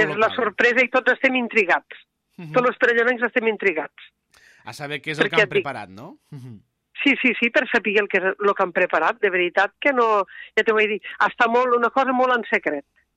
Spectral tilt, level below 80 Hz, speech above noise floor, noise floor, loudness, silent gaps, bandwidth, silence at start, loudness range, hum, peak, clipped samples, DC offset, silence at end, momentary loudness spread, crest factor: -5 dB/octave; -68 dBFS; 34 dB; -54 dBFS; -20 LUFS; none; 11 kHz; 0 s; 4 LU; none; -6 dBFS; under 0.1%; under 0.1%; 0.35 s; 12 LU; 16 dB